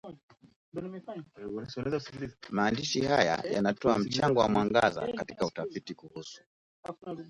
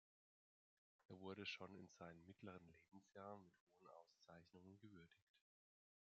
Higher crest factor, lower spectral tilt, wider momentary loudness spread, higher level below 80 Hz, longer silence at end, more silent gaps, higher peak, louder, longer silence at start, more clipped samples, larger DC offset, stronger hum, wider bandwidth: about the same, 22 dB vs 24 dB; first, -5 dB/octave vs -3.5 dB/octave; first, 18 LU vs 15 LU; first, -60 dBFS vs under -90 dBFS; second, 0 s vs 0.7 s; first, 0.23-0.28 s, 0.56-0.72 s, 6.46-6.83 s vs 1.05-1.09 s, 3.60-3.67 s, 5.22-5.34 s; first, -10 dBFS vs -40 dBFS; first, -30 LUFS vs -60 LUFS; second, 0.05 s vs 1 s; neither; neither; neither; first, 11.5 kHz vs 7.2 kHz